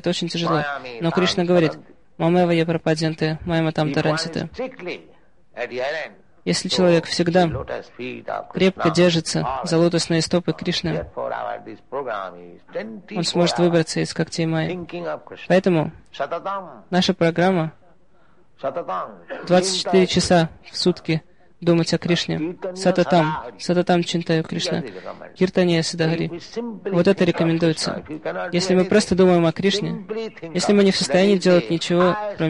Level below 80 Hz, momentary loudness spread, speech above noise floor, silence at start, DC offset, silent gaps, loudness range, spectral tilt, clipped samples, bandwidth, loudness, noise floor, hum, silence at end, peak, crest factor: -50 dBFS; 13 LU; 38 dB; 0.05 s; 0.3%; none; 5 LU; -5.5 dB/octave; under 0.1%; 11 kHz; -21 LUFS; -58 dBFS; none; 0 s; -4 dBFS; 16 dB